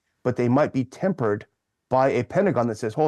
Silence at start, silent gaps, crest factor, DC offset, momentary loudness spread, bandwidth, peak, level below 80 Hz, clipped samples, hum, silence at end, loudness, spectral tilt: 0.25 s; none; 16 dB; under 0.1%; 5 LU; 11.5 kHz; -8 dBFS; -64 dBFS; under 0.1%; none; 0 s; -23 LUFS; -8 dB/octave